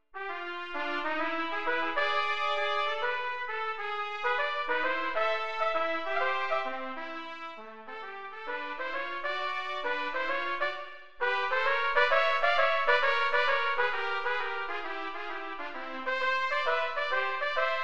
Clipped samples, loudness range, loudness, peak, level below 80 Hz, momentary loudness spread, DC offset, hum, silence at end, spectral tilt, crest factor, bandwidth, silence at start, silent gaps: under 0.1%; 8 LU; -30 LUFS; -10 dBFS; -64 dBFS; 13 LU; 0.9%; none; 0 s; -2.5 dB/octave; 20 dB; 8.8 kHz; 0 s; none